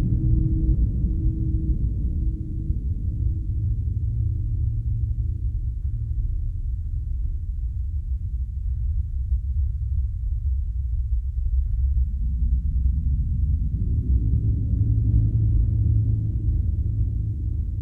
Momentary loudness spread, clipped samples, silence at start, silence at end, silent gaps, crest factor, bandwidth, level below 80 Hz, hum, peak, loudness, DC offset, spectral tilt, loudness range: 7 LU; under 0.1%; 0 s; 0 s; none; 14 dB; 0.7 kHz; -24 dBFS; none; -8 dBFS; -26 LUFS; under 0.1%; -12.5 dB/octave; 6 LU